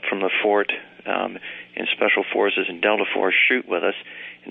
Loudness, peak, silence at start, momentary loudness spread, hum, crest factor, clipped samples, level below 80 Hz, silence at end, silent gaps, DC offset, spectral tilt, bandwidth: -21 LUFS; -4 dBFS; 0 s; 15 LU; none; 18 dB; under 0.1%; -76 dBFS; 0 s; none; under 0.1%; -7 dB/octave; 4 kHz